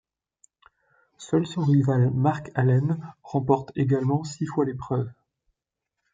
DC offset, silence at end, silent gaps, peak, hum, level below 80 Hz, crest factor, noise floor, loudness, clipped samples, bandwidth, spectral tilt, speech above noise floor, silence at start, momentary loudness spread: under 0.1%; 1 s; none; -6 dBFS; none; -60 dBFS; 18 dB; -84 dBFS; -25 LUFS; under 0.1%; 7.8 kHz; -8 dB/octave; 61 dB; 1.2 s; 8 LU